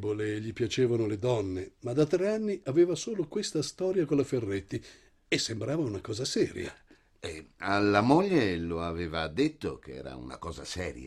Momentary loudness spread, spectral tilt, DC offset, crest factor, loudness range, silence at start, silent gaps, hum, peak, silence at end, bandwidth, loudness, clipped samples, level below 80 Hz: 15 LU; -5.5 dB/octave; under 0.1%; 20 dB; 3 LU; 0 s; none; none; -10 dBFS; 0 s; 12.5 kHz; -30 LUFS; under 0.1%; -58 dBFS